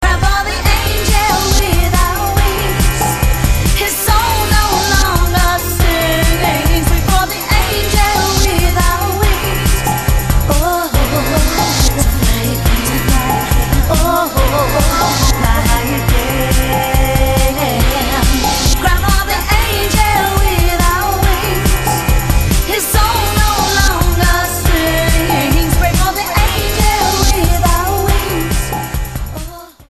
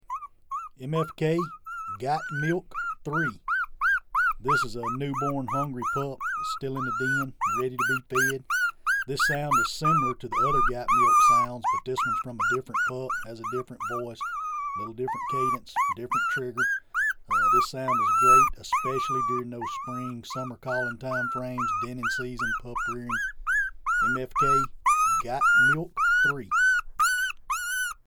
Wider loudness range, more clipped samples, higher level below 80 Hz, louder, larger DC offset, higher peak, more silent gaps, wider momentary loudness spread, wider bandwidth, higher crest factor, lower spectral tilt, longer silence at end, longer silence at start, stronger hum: second, 1 LU vs 7 LU; neither; first, -16 dBFS vs -48 dBFS; first, -13 LUFS vs -26 LUFS; first, 0.4% vs under 0.1%; first, 0 dBFS vs -8 dBFS; neither; second, 2 LU vs 11 LU; second, 15.5 kHz vs over 20 kHz; second, 12 dB vs 18 dB; about the same, -4 dB/octave vs -4 dB/octave; about the same, 0.2 s vs 0.1 s; about the same, 0 s vs 0.1 s; neither